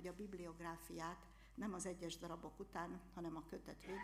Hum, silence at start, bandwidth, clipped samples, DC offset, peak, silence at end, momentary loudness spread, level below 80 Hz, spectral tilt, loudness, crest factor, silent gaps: none; 0 s; 15.5 kHz; under 0.1%; under 0.1%; -32 dBFS; 0 s; 6 LU; -66 dBFS; -4.5 dB/octave; -51 LUFS; 18 dB; none